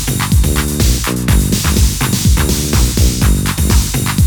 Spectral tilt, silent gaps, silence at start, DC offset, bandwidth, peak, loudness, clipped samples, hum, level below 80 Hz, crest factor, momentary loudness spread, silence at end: -4.5 dB/octave; none; 0 s; under 0.1%; over 20 kHz; 0 dBFS; -13 LUFS; under 0.1%; none; -16 dBFS; 12 dB; 2 LU; 0 s